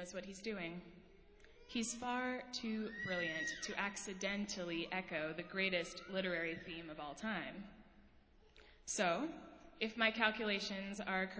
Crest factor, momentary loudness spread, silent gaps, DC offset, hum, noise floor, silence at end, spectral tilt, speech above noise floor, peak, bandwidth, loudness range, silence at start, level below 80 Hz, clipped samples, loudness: 26 dB; 12 LU; none; under 0.1%; none; -66 dBFS; 0 s; -3 dB/octave; 25 dB; -18 dBFS; 8 kHz; 4 LU; 0 s; -70 dBFS; under 0.1%; -41 LUFS